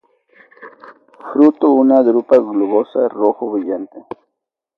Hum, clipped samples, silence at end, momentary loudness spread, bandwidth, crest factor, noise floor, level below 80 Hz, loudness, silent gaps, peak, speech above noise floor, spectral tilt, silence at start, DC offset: none; under 0.1%; 0.8 s; 23 LU; 5 kHz; 16 dB; -77 dBFS; -70 dBFS; -14 LUFS; none; 0 dBFS; 64 dB; -9 dB/octave; 0.6 s; under 0.1%